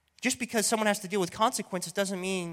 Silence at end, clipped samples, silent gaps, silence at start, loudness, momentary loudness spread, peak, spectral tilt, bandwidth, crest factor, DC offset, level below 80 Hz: 0 s; under 0.1%; none; 0.2 s; -29 LUFS; 6 LU; -10 dBFS; -3 dB/octave; 16.5 kHz; 20 dB; under 0.1%; -70 dBFS